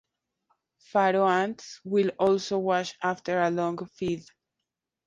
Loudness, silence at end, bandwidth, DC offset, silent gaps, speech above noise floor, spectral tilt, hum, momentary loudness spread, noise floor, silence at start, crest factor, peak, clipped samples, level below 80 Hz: -27 LUFS; 0.85 s; 9 kHz; under 0.1%; none; 60 dB; -5.5 dB/octave; none; 9 LU; -86 dBFS; 0.95 s; 18 dB; -10 dBFS; under 0.1%; -68 dBFS